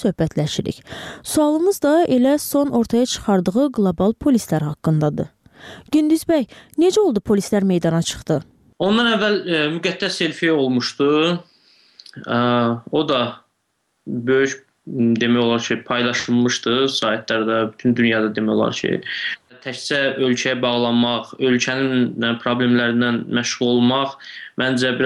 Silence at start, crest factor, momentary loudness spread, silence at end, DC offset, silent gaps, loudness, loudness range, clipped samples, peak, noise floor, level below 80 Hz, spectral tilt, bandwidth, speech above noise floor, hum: 0 s; 14 dB; 7 LU; 0 s; under 0.1%; none; -19 LUFS; 2 LU; under 0.1%; -4 dBFS; -70 dBFS; -52 dBFS; -5 dB/octave; 15 kHz; 52 dB; none